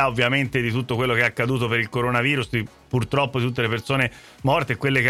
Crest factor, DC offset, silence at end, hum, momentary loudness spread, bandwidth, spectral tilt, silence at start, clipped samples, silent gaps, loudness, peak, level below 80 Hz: 16 dB; under 0.1%; 0 s; none; 6 LU; 14 kHz; -6 dB/octave; 0 s; under 0.1%; none; -22 LUFS; -6 dBFS; -48 dBFS